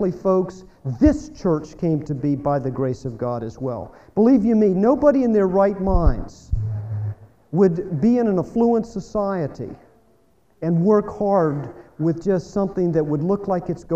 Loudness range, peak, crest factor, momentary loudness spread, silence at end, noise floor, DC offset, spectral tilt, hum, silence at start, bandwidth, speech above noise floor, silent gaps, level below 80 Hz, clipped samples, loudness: 4 LU; -4 dBFS; 18 dB; 12 LU; 0 s; -60 dBFS; under 0.1%; -9.5 dB/octave; none; 0 s; 8 kHz; 40 dB; none; -32 dBFS; under 0.1%; -21 LUFS